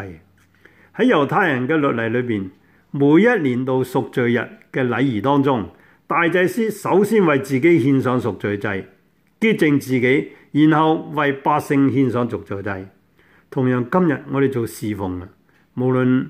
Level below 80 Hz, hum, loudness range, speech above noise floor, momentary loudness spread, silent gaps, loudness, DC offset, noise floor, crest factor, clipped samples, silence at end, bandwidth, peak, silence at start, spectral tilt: -60 dBFS; none; 3 LU; 37 dB; 12 LU; none; -18 LUFS; under 0.1%; -55 dBFS; 16 dB; under 0.1%; 0 s; 15.5 kHz; -4 dBFS; 0 s; -7 dB/octave